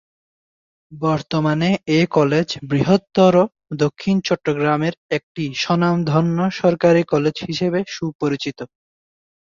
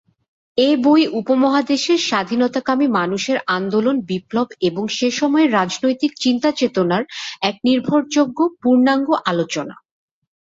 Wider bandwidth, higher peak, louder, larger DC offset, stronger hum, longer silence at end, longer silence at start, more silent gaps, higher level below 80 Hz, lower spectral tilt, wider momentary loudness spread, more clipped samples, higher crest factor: about the same, 7.4 kHz vs 7.8 kHz; about the same, -2 dBFS vs -2 dBFS; about the same, -19 LUFS vs -18 LUFS; neither; neither; first, 0.9 s vs 0.7 s; first, 0.9 s vs 0.55 s; first, 4.98-5.09 s, 5.23-5.35 s, 8.15-8.19 s vs none; first, -56 dBFS vs -62 dBFS; first, -6.5 dB/octave vs -4.5 dB/octave; first, 10 LU vs 7 LU; neither; about the same, 16 dB vs 16 dB